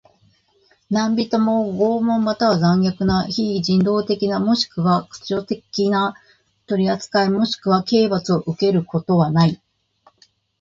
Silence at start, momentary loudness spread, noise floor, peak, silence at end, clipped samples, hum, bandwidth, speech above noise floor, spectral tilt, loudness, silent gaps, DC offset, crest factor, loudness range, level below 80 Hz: 0.9 s; 6 LU; -60 dBFS; -2 dBFS; 1.05 s; under 0.1%; none; 7.6 kHz; 41 dB; -6.5 dB/octave; -19 LUFS; none; under 0.1%; 16 dB; 2 LU; -50 dBFS